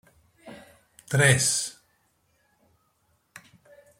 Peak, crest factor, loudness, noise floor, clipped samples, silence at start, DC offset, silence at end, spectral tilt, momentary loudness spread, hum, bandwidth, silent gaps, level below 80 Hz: -4 dBFS; 24 dB; -22 LUFS; -70 dBFS; under 0.1%; 0.45 s; under 0.1%; 2.3 s; -3 dB/octave; 28 LU; none; 16 kHz; none; -62 dBFS